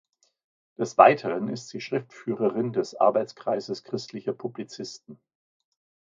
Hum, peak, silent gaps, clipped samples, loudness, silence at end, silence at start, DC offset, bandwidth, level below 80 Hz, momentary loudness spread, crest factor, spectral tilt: none; 0 dBFS; none; under 0.1%; -25 LUFS; 1 s; 0.8 s; under 0.1%; 7.6 kHz; -76 dBFS; 18 LU; 26 dB; -5.5 dB/octave